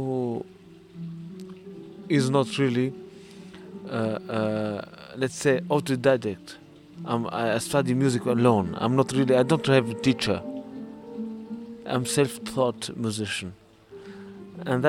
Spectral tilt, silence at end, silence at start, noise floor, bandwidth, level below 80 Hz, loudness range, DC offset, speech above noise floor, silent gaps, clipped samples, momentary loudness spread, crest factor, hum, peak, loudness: -5.5 dB/octave; 0 s; 0 s; -49 dBFS; 16.5 kHz; -62 dBFS; 6 LU; under 0.1%; 25 dB; none; under 0.1%; 21 LU; 20 dB; none; -6 dBFS; -25 LUFS